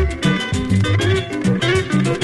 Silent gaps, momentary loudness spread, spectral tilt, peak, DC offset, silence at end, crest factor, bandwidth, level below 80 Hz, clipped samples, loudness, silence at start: none; 3 LU; -6 dB/octave; -4 dBFS; under 0.1%; 0 s; 14 dB; 11.5 kHz; -30 dBFS; under 0.1%; -18 LUFS; 0 s